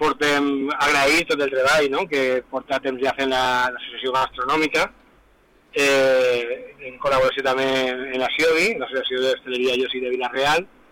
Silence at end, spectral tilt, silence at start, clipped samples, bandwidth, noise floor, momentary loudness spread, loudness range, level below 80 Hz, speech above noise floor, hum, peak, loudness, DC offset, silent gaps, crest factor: 0.25 s; -3 dB/octave; 0 s; under 0.1%; 18.5 kHz; -56 dBFS; 7 LU; 2 LU; -52 dBFS; 35 dB; none; -12 dBFS; -20 LUFS; under 0.1%; none; 8 dB